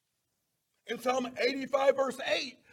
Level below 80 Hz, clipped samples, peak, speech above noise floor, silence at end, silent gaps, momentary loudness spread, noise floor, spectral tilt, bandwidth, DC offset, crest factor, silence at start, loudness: -78 dBFS; under 0.1%; -12 dBFS; 50 dB; 0.2 s; none; 6 LU; -81 dBFS; -2.5 dB/octave; 16 kHz; under 0.1%; 20 dB; 0.85 s; -31 LUFS